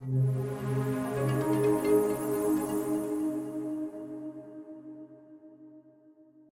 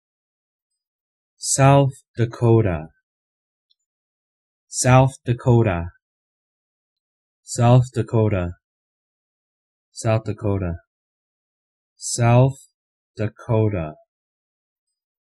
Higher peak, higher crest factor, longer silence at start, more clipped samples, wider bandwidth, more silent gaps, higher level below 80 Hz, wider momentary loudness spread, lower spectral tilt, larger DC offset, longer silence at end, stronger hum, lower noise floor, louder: second, -14 dBFS vs -2 dBFS; about the same, 16 dB vs 20 dB; second, 0 s vs 1.4 s; neither; first, 16.5 kHz vs 12.5 kHz; second, none vs 2.08-2.14 s, 3.03-3.69 s, 3.86-4.68 s, 6.02-7.43 s, 8.64-9.92 s, 10.87-11.96 s, 12.74-13.14 s; second, -64 dBFS vs -48 dBFS; first, 19 LU vs 15 LU; first, -7.5 dB/octave vs -6 dB/octave; neither; second, 0.7 s vs 1.3 s; neither; second, -58 dBFS vs under -90 dBFS; second, -30 LUFS vs -19 LUFS